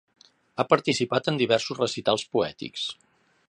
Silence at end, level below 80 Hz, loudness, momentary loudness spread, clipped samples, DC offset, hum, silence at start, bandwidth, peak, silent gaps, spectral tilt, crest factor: 0.55 s; -66 dBFS; -25 LUFS; 10 LU; under 0.1%; under 0.1%; none; 0.55 s; 10.5 kHz; -2 dBFS; none; -4.5 dB/octave; 24 dB